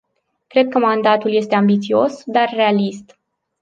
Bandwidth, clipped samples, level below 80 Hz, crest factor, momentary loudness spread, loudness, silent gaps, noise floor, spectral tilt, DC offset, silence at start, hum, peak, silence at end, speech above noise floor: 7.6 kHz; under 0.1%; -66 dBFS; 16 dB; 4 LU; -16 LUFS; none; -55 dBFS; -6.5 dB/octave; under 0.1%; 0.55 s; none; -2 dBFS; 0.6 s; 39 dB